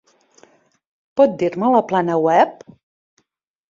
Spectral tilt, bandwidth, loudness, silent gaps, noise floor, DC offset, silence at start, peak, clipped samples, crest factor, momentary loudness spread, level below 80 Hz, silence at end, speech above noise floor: -7 dB/octave; 7.4 kHz; -17 LUFS; none; -72 dBFS; under 0.1%; 1.15 s; -2 dBFS; under 0.1%; 18 dB; 5 LU; -66 dBFS; 1.15 s; 56 dB